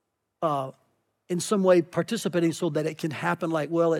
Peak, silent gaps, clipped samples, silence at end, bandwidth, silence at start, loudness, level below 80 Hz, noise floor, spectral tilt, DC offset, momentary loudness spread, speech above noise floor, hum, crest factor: -8 dBFS; none; under 0.1%; 0 s; 16 kHz; 0.4 s; -26 LUFS; -80 dBFS; -68 dBFS; -5.5 dB/octave; under 0.1%; 10 LU; 43 dB; none; 18 dB